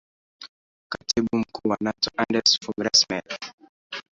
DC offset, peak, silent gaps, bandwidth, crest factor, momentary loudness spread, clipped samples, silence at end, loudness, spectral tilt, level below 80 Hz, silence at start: under 0.1%; -4 dBFS; 0.49-0.90 s, 3.53-3.58 s, 3.69-3.90 s; 7.8 kHz; 22 dB; 17 LU; under 0.1%; 0.15 s; -22 LUFS; -2.5 dB/octave; -58 dBFS; 0.4 s